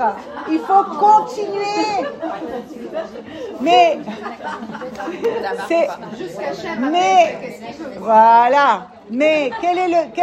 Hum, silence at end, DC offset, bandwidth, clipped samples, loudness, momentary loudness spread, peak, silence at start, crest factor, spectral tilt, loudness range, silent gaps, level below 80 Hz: none; 0 s; under 0.1%; 12.5 kHz; under 0.1%; -16 LUFS; 16 LU; 0 dBFS; 0 s; 16 dB; -4 dB/octave; 5 LU; none; -60 dBFS